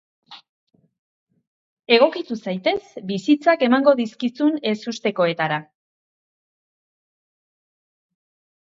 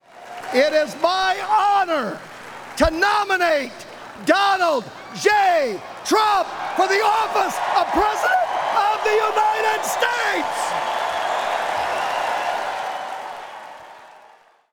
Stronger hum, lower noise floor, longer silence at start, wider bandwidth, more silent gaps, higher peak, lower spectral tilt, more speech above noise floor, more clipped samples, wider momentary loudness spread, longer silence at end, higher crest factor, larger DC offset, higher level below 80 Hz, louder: neither; first, under -90 dBFS vs -51 dBFS; first, 0.3 s vs 0.15 s; second, 7.6 kHz vs over 20 kHz; first, 0.49-0.67 s, 0.99-1.26 s, 1.47-1.77 s vs none; about the same, -2 dBFS vs -4 dBFS; first, -5.5 dB/octave vs -2.5 dB/octave; first, over 70 dB vs 32 dB; neither; second, 11 LU vs 16 LU; first, 3.05 s vs 0.6 s; about the same, 20 dB vs 18 dB; neither; second, -72 dBFS vs -46 dBFS; about the same, -20 LUFS vs -20 LUFS